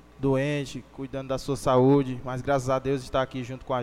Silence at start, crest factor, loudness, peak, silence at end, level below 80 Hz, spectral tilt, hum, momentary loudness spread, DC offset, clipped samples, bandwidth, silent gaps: 0.2 s; 16 dB; -26 LUFS; -10 dBFS; 0 s; -48 dBFS; -7 dB/octave; none; 15 LU; under 0.1%; under 0.1%; 14.5 kHz; none